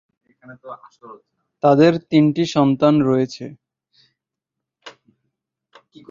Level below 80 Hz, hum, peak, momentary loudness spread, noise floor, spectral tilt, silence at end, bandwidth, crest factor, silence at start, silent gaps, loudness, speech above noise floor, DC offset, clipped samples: -62 dBFS; none; -2 dBFS; 24 LU; -84 dBFS; -7.5 dB/octave; 1.2 s; 7.4 kHz; 20 dB; 0.5 s; none; -16 LUFS; 66 dB; under 0.1%; under 0.1%